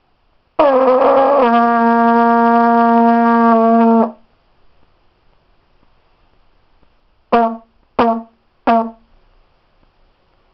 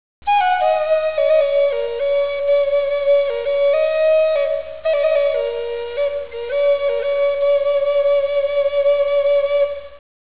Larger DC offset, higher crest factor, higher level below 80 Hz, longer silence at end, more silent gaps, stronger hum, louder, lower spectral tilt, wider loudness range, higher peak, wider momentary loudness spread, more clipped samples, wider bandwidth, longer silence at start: second, under 0.1% vs 1%; about the same, 12 dB vs 12 dB; about the same, -52 dBFS vs -50 dBFS; first, 1.6 s vs 0.25 s; neither; neither; first, -12 LUFS vs -18 LUFS; first, -9 dB/octave vs -5.5 dB/octave; first, 13 LU vs 2 LU; about the same, -4 dBFS vs -6 dBFS; first, 10 LU vs 7 LU; neither; first, 5.6 kHz vs 4 kHz; first, 0.6 s vs 0.25 s